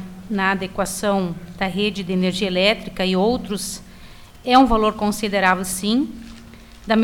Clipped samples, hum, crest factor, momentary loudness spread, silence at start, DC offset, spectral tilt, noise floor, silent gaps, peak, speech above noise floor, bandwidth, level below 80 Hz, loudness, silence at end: under 0.1%; none; 18 dB; 12 LU; 0 s; under 0.1%; -4.5 dB/octave; -41 dBFS; none; -4 dBFS; 22 dB; 18 kHz; -40 dBFS; -20 LUFS; 0 s